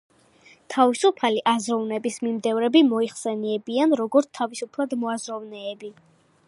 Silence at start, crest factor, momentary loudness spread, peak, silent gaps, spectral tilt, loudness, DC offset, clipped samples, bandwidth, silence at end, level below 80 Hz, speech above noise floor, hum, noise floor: 0.7 s; 20 dB; 15 LU; -4 dBFS; none; -4 dB/octave; -23 LUFS; under 0.1%; under 0.1%; 11.5 kHz; 0.55 s; -78 dBFS; 32 dB; none; -55 dBFS